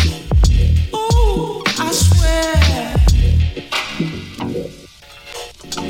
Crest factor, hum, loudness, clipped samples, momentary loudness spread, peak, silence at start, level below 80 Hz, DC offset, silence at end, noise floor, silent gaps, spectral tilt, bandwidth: 14 dB; none; -16 LUFS; under 0.1%; 14 LU; 0 dBFS; 0 s; -18 dBFS; under 0.1%; 0 s; -40 dBFS; none; -5 dB/octave; 16.5 kHz